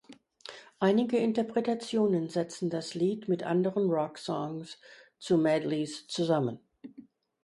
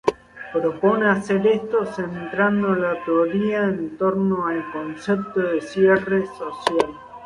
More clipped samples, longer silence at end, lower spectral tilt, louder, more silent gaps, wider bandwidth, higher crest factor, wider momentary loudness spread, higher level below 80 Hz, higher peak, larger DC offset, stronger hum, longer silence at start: neither; first, 0.45 s vs 0 s; about the same, -6.5 dB/octave vs -7 dB/octave; second, -30 LUFS vs -21 LUFS; neither; about the same, 11.5 kHz vs 11.5 kHz; about the same, 18 dB vs 18 dB; first, 20 LU vs 9 LU; second, -76 dBFS vs -58 dBFS; second, -12 dBFS vs -2 dBFS; neither; neither; about the same, 0.1 s vs 0.05 s